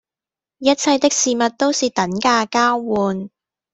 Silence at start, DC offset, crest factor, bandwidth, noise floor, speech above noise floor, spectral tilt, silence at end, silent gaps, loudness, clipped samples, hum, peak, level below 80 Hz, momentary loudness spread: 0.6 s; under 0.1%; 16 dB; 8.4 kHz; -90 dBFS; 73 dB; -3 dB/octave; 0.45 s; none; -17 LUFS; under 0.1%; none; -2 dBFS; -58 dBFS; 6 LU